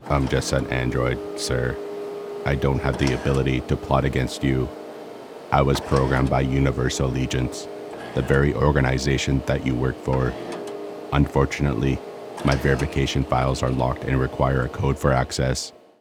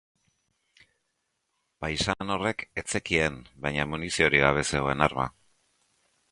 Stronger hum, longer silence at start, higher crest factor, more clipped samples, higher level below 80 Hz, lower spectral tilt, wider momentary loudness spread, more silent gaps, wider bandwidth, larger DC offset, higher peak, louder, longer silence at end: neither; second, 0 s vs 1.8 s; about the same, 22 dB vs 26 dB; neither; first, -32 dBFS vs -48 dBFS; first, -6 dB/octave vs -4 dB/octave; about the same, 12 LU vs 11 LU; neither; first, 14.5 kHz vs 11.5 kHz; neither; about the same, -2 dBFS vs -4 dBFS; first, -23 LUFS vs -27 LUFS; second, 0.3 s vs 1 s